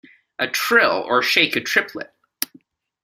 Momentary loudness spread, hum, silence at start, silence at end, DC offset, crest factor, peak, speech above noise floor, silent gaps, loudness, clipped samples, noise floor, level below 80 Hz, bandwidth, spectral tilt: 15 LU; none; 0.4 s; 0.6 s; under 0.1%; 22 dB; 0 dBFS; 34 dB; none; -18 LUFS; under 0.1%; -53 dBFS; -66 dBFS; 16 kHz; -2 dB/octave